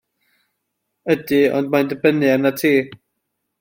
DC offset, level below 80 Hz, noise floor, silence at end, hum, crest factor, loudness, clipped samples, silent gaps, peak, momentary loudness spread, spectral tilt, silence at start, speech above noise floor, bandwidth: under 0.1%; -64 dBFS; -75 dBFS; 0.65 s; none; 18 dB; -17 LUFS; under 0.1%; none; -2 dBFS; 5 LU; -6 dB/octave; 1.05 s; 59 dB; 16.5 kHz